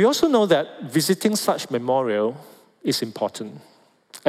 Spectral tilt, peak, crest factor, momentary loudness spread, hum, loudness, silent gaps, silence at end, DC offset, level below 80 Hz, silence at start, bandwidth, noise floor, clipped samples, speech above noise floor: -4.5 dB/octave; -6 dBFS; 16 dB; 12 LU; none; -22 LUFS; none; 0 s; under 0.1%; -68 dBFS; 0 s; 16.5 kHz; -48 dBFS; under 0.1%; 26 dB